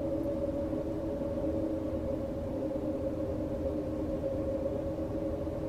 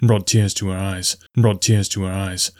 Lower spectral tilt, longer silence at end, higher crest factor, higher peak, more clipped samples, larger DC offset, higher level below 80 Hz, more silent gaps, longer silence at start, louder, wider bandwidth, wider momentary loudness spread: first, -9 dB/octave vs -4.5 dB/octave; about the same, 0 s vs 0.1 s; about the same, 12 dB vs 14 dB; second, -20 dBFS vs -4 dBFS; neither; neither; about the same, -46 dBFS vs -50 dBFS; neither; about the same, 0 s vs 0 s; second, -34 LUFS vs -19 LUFS; second, 14.5 kHz vs 16 kHz; second, 2 LU vs 7 LU